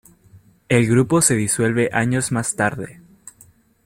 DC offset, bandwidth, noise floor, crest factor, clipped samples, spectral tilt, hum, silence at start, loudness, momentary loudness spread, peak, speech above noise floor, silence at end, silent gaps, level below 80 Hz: under 0.1%; 16 kHz; -52 dBFS; 18 dB; under 0.1%; -5 dB/octave; none; 0.7 s; -18 LUFS; 7 LU; -2 dBFS; 34 dB; 0.95 s; none; -52 dBFS